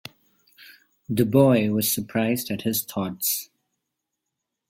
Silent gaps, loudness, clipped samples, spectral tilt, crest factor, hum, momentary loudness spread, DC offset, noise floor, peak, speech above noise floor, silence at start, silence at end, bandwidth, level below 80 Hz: none; -23 LUFS; under 0.1%; -5 dB/octave; 20 dB; none; 11 LU; under 0.1%; -82 dBFS; -4 dBFS; 60 dB; 1.1 s; 1.25 s; 17 kHz; -60 dBFS